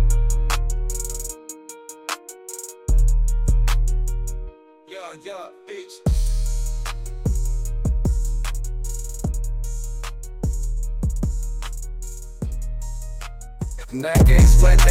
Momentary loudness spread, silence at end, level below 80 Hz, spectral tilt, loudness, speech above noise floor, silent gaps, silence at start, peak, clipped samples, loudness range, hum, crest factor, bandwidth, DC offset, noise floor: 15 LU; 0 s; -20 dBFS; -5 dB/octave; -24 LUFS; 28 dB; none; 0 s; -4 dBFS; under 0.1%; 5 LU; none; 14 dB; 15.5 kHz; under 0.1%; -42 dBFS